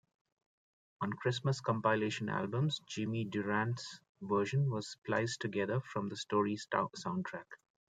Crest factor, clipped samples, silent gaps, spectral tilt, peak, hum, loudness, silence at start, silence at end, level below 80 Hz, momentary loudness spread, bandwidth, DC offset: 20 dB; under 0.1%; 4.09-4.15 s; -6 dB/octave; -16 dBFS; none; -36 LUFS; 1 s; 0.45 s; -78 dBFS; 8 LU; 9.4 kHz; under 0.1%